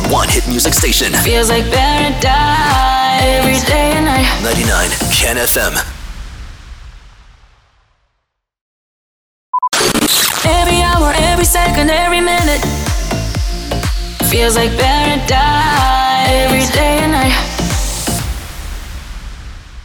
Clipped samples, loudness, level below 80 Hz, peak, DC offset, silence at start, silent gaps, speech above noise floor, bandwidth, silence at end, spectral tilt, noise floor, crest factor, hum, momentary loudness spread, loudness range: under 0.1%; -12 LUFS; -20 dBFS; -2 dBFS; under 0.1%; 0 s; 8.61-9.53 s; 58 dB; over 20 kHz; 0 s; -3.5 dB/octave; -69 dBFS; 12 dB; none; 14 LU; 6 LU